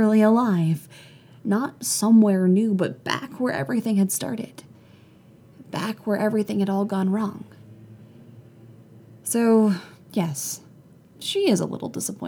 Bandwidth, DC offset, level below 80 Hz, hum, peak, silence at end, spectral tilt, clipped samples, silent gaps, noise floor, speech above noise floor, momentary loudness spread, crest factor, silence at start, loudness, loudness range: 18.5 kHz; under 0.1%; -72 dBFS; none; -8 dBFS; 0 s; -5.5 dB/octave; under 0.1%; none; -51 dBFS; 29 dB; 13 LU; 16 dB; 0 s; -23 LUFS; 6 LU